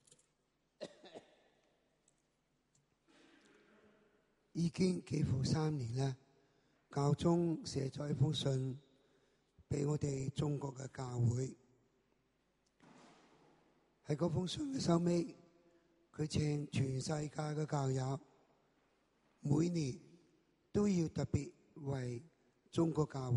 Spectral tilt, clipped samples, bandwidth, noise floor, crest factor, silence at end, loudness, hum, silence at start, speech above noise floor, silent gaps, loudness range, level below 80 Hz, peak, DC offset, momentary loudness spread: -6.5 dB/octave; under 0.1%; 11.5 kHz; -81 dBFS; 22 dB; 0 s; -38 LUFS; none; 0.8 s; 44 dB; none; 6 LU; -66 dBFS; -18 dBFS; under 0.1%; 14 LU